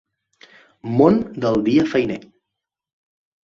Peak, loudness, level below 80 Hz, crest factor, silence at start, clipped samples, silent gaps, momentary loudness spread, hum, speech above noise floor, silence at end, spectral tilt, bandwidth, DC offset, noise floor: -2 dBFS; -18 LUFS; -54 dBFS; 20 dB; 0.85 s; under 0.1%; none; 14 LU; none; 65 dB; 1.25 s; -8 dB/octave; 7.4 kHz; under 0.1%; -83 dBFS